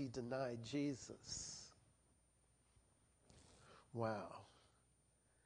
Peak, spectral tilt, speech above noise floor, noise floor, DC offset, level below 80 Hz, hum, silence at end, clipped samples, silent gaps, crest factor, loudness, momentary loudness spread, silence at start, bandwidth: -28 dBFS; -4.5 dB/octave; 31 dB; -78 dBFS; under 0.1%; -76 dBFS; none; 0.85 s; under 0.1%; none; 22 dB; -47 LUFS; 22 LU; 0 s; 10 kHz